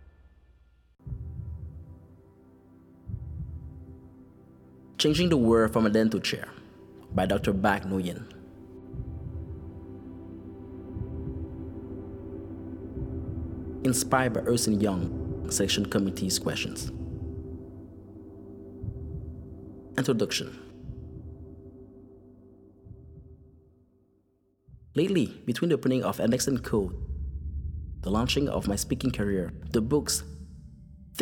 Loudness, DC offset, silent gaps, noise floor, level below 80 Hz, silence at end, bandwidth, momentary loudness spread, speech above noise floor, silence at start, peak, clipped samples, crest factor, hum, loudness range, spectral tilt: -29 LUFS; under 0.1%; none; -69 dBFS; -44 dBFS; 0 s; 18.5 kHz; 22 LU; 43 dB; 0 s; -6 dBFS; under 0.1%; 24 dB; none; 16 LU; -5 dB/octave